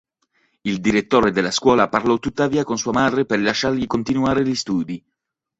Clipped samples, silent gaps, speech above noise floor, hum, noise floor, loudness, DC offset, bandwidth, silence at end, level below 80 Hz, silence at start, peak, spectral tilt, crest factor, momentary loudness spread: under 0.1%; none; 61 dB; none; -80 dBFS; -19 LUFS; under 0.1%; 8 kHz; 0.6 s; -48 dBFS; 0.65 s; -2 dBFS; -4.5 dB/octave; 18 dB; 7 LU